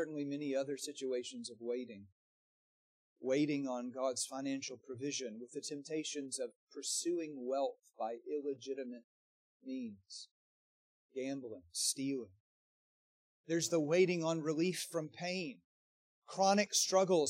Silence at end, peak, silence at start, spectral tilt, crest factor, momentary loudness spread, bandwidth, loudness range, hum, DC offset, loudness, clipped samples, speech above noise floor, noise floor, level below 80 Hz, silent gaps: 0 s; -18 dBFS; 0 s; -3.5 dB/octave; 22 dB; 15 LU; 15 kHz; 7 LU; none; under 0.1%; -38 LUFS; under 0.1%; over 52 dB; under -90 dBFS; under -90 dBFS; 2.12-3.16 s, 6.56-6.67 s, 9.04-9.60 s, 10.31-11.09 s, 12.40-13.44 s, 15.64-16.22 s